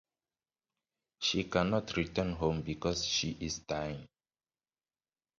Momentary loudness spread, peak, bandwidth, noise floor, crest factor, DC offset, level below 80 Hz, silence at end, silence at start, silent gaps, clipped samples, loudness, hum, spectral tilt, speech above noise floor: 7 LU; -16 dBFS; 7.8 kHz; under -90 dBFS; 22 dB; under 0.1%; -54 dBFS; 1.35 s; 1.2 s; none; under 0.1%; -34 LUFS; none; -4 dB/octave; over 56 dB